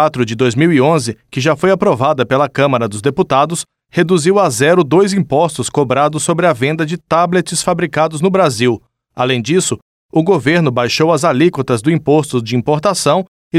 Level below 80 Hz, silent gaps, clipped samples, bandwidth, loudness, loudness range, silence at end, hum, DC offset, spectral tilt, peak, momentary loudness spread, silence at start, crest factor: -50 dBFS; 9.82-10.09 s, 13.28-13.51 s; under 0.1%; 15 kHz; -13 LUFS; 2 LU; 0 s; none; under 0.1%; -5 dB/octave; 0 dBFS; 6 LU; 0 s; 12 dB